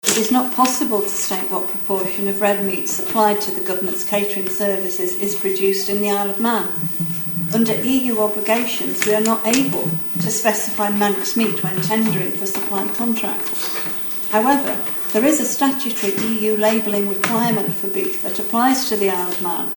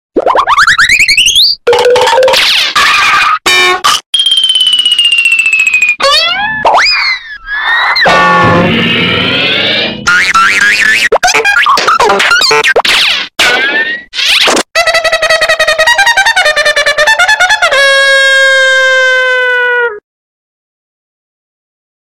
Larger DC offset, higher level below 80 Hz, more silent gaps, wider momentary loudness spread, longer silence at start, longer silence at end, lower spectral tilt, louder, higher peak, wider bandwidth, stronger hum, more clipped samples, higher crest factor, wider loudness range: neither; second, -68 dBFS vs -40 dBFS; second, none vs 4.06-4.13 s; about the same, 4 LU vs 4 LU; about the same, 0.05 s vs 0.15 s; second, 0 s vs 2.05 s; first, -4 dB/octave vs -1.5 dB/octave; second, -17 LUFS vs -6 LUFS; about the same, 0 dBFS vs 0 dBFS; first, 19.5 kHz vs 17 kHz; neither; neither; first, 18 dB vs 8 dB; about the same, 1 LU vs 2 LU